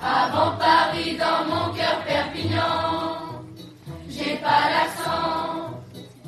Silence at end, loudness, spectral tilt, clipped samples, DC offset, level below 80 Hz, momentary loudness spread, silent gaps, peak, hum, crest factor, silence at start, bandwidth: 0 s; -22 LUFS; -4.5 dB/octave; under 0.1%; under 0.1%; -54 dBFS; 19 LU; none; -6 dBFS; none; 18 dB; 0 s; 13 kHz